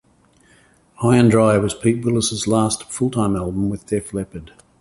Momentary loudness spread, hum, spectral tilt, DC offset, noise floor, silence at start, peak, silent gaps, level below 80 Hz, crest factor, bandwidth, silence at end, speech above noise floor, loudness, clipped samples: 12 LU; none; -5.5 dB/octave; under 0.1%; -55 dBFS; 1 s; -2 dBFS; none; -44 dBFS; 18 dB; 11.5 kHz; 0.35 s; 37 dB; -19 LUFS; under 0.1%